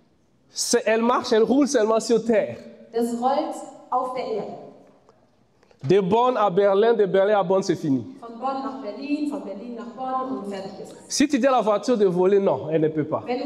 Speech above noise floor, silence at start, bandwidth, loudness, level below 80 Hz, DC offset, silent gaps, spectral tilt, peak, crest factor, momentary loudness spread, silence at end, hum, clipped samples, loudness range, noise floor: 40 dB; 0.55 s; 14.5 kHz; -22 LUFS; -66 dBFS; under 0.1%; none; -5 dB/octave; -8 dBFS; 14 dB; 15 LU; 0 s; none; under 0.1%; 7 LU; -61 dBFS